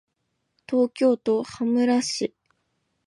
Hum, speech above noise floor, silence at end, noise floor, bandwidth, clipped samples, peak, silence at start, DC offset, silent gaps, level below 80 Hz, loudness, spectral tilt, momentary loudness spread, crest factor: none; 54 dB; 0.8 s; -76 dBFS; 11.5 kHz; under 0.1%; -10 dBFS; 0.7 s; under 0.1%; none; -70 dBFS; -23 LUFS; -4 dB/octave; 7 LU; 16 dB